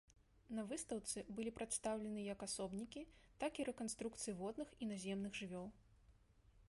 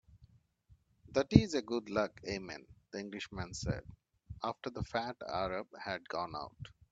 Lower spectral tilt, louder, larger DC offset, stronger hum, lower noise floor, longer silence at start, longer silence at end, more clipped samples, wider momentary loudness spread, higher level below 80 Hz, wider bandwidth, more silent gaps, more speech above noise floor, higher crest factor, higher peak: second, -4 dB/octave vs -6 dB/octave; second, -47 LUFS vs -37 LUFS; neither; neither; about the same, -71 dBFS vs -68 dBFS; about the same, 0.1 s vs 0.15 s; second, 0 s vs 0.2 s; neither; second, 7 LU vs 18 LU; second, -70 dBFS vs -54 dBFS; first, 11.5 kHz vs 8 kHz; neither; second, 24 dB vs 32 dB; second, 18 dB vs 32 dB; second, -30 dBFS vs -6 dBFS